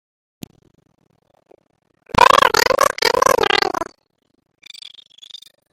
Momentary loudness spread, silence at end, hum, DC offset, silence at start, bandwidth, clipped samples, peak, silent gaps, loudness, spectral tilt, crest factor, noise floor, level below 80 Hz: 26 LU; 1.9 s; none; under 0.1%; 2.15 s; 17 kHz; under 0.1%; 0 dBFS; none; -14 LUFS; -2 dB/octave; 20 dB; -42 dBFS; -48 dBFS